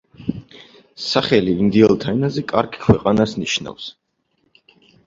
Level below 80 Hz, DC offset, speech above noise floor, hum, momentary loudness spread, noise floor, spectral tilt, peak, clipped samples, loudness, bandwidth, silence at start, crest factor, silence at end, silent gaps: -44 dBFS; under 0.1%; 49 dB; none; 16 LU; -67 dBFS; -6 dB/octave; 0 dBFS; under 0.1%; -18 LUFS; 7.6 kHz; 0.2 s; 20 dB; 1.15 s; none